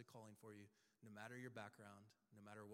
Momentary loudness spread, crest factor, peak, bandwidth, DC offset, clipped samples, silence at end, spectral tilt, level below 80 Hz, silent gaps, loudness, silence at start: 11 LU; 20 dB; -40 dBFS; 16 kHz; under 0.1%; under 0.1%; 0 s; -5.5 dB/octave; under -90 dBFS; none; -60 LUFS; 0 s